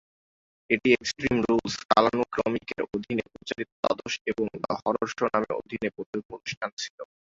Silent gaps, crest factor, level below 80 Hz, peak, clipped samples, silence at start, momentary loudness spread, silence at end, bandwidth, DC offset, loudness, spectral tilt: 1.85-1.89 s, 3.72-3.83 s, 4.21-4.25 s, 6.06-6.13 s, 6.25-6.29 s, 6.57-6.61 s, 6.73-6.77 s, 6.90-6.98 s; 24 dB; -58 dBFS; -4 dBFS; under 0.1%; 0.7 s; 12 LU; 0.2 s; 7.8 kHz; under 0.1%; -28 LUFS; -4.5 dB/octave